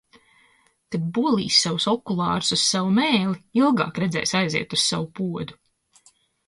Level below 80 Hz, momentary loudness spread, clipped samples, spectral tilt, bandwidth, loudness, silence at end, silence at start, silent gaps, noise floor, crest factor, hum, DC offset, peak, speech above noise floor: -60 dBFS; 11 LU; under 0.1%; -4 dB/octave; 11.5 kHz; -22 LUFS; 0.95 s; 0.9 s; none; -61 dBFS; 20 dB; none; under 0.1%; -4 dBFS; 39 dB